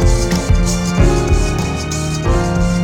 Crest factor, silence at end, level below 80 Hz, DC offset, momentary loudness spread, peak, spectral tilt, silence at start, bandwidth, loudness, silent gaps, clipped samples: 14 dB; 0 s; -18 dBFS; under 0.1%; 5 LU; 0 dBFS; -5.5 dB/octave; 0 s; 15.5 kHz; -16 LUFS; none; under 0.1%